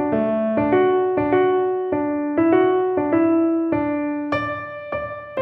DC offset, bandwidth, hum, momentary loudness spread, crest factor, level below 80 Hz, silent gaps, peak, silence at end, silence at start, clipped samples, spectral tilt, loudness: under 0.1%; 5.8 kHz; none; 11 LU; 16 dB; -52 dBFS; none; -4 dBFS; 0 s; 0 s; under 0.1%; -9.5 dB/octave; -20 LUFS